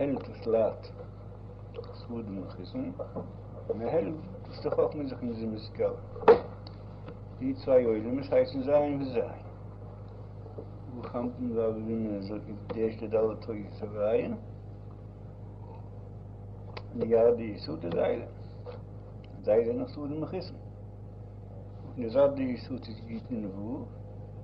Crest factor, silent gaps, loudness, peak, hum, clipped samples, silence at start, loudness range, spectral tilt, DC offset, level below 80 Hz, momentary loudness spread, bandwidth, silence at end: 24 dB; none; -31 LUFS; -8 dBFS; none; under 0.1%; 0 s; 7 LU; -10 dB/octave; under 0.1%; -52 dBFS; 19 LU; 5.6 kHz; 0 s